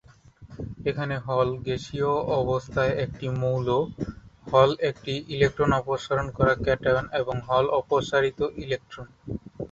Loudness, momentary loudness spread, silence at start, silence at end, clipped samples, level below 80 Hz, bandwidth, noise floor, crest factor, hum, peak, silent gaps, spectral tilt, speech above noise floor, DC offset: -25 LUFS; 14 LU; 0.4 s; 0.05 s; under 0.1%; -46 dBFS; 7.8 kHz; -50 dBFS; 20 dB; none; -4 dBFS; none; -6.5 dB/octave; 25 dB; under 0.1%